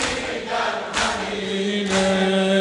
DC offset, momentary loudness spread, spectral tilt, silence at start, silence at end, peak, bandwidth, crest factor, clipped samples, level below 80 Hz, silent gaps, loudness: under 0.1%; 6 LU; -4 dB/octave; 0 s; 0 s; -8 dBFS; 11.5 kHz; 14 dB; under 0.1%; -48 dBFS; none; -22 LUFS